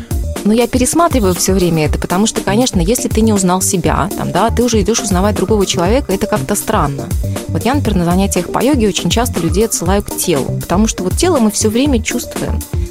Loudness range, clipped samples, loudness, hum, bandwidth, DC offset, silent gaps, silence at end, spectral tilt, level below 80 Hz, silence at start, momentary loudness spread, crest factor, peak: 2 LU; under 0.1%; -14 LUFS; none; 16.5 kHz; under 0.1%; none; 0 s; -5 dB/octave; -24 dBFS; 0 s; 5 LU; 14 dB; 0 dBFS